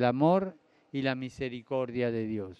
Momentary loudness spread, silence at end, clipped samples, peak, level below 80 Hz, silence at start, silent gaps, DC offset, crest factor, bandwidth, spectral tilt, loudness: 12 LU; 0.05 s; under 0.1%; -12 dBFS; -64 dBFS; 0 s; none; under 0.1%; 18 dB; 9 kHz; -8 dB/octave; -31 LUFS